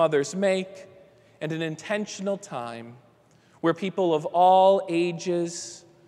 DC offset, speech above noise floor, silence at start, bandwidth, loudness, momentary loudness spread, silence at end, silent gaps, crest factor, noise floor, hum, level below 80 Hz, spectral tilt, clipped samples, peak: under 0.1%; 34 dB; 0 s; 11.5 kHz; -24 LUFS; 17 LU; 0.3 s; none; 18 dB; -58 dBFS; none; -76 dBFS; -5 dB/octave; under 0.1%; -8 dBFS